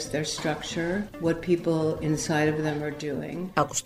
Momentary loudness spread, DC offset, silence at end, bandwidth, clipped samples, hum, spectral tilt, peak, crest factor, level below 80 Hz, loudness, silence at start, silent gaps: 7 LU; under 0.1%; 0 s; 15.5 kHz; under 0.1%; none; -5 dB/octave; -6 dBFS; 20 dB; -52 dBFS; -28 LUFS; 0 s; none